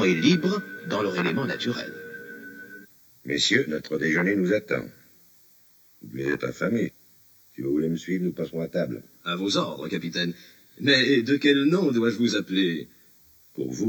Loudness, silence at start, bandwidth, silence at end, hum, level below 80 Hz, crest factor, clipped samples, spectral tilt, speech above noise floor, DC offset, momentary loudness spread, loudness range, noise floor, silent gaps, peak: -25 LUFS; 0 s; over 20 kHz; 0 s; none; -64 dBFS; 20 dB; under 0.1%; -5 dB/octave; 33 dB; under 0.1%; 19 LU; 7 LU; -57 dBFS; none; -6 dBFS